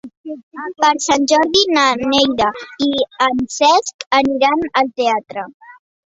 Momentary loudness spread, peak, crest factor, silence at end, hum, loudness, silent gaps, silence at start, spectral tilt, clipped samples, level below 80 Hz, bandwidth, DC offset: 16 LU; 0 dBFS; 16 dB; 0.4 s; none; -15 LUFS; 0.17-0.24 s, 0.43-0.51 s, 3.94-3.99 s, 4.06-4.11 s, 5.54-5.60 s; 0.05 s; -2 dB/octave; under 0.1%; -52 dBFS; 8 kHz; under 0.1%